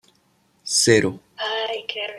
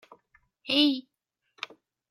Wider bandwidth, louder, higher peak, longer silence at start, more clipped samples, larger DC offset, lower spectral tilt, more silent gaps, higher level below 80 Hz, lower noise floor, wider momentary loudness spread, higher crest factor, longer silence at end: about the same, 14.5 kHz vs 14 kHz; first, -20 LUFS vs -25 LUFS; first, -2 dBFS vs -10 dBFS; about the same, 0.65 s vs 0.65 s; neither; neither; about the same, -3 dB/octave vs -3 dB/octave; neither; first, -64 dBFS vs -82 dBFS; second, -62 dBFS vs -70 dBFS; second, 13 LU vs 18 LU; about the same, 22 dB vs 22 dB; second, 0 s vs 1.1 s